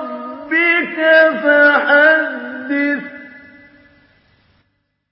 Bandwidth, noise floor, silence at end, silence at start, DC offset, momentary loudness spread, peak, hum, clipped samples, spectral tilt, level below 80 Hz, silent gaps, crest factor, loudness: 5.8 kHz; -66 dBFS; 1.75 s; 0 s; under 0.1%; 16 LU; 0 dBFS; none; under 0.1%; -8 dB/octave; -66 dBFS; none; 16 dB; -13 LUFS